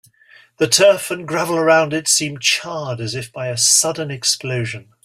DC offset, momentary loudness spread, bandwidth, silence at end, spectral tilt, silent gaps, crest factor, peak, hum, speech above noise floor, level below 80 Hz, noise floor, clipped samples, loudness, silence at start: under 0.1%; 12 LU; 16 kHz; 0.2 s; -2.5 dB/octave; none; 18 dB; 0 dBFS; none; 32 dB; -60 dBFS; -49 dBFS; under 0.1%; -16 LUFS; 0.6 s